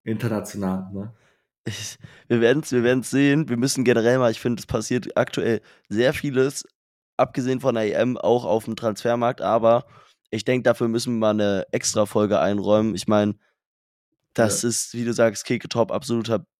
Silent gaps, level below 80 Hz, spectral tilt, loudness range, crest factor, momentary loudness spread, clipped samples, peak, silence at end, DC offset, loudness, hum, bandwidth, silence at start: 1.58-1.64 s, 6.75-7.18 s, 13.66-14.12 s; -58 dBFS; -5 dB/octave; 3 LU; 18 dB; 10 LU; under 0.1%; -4 dBFS; 0.15 s; under 0.1%; -22 LUFS; none; 16 kHz; 0.05 s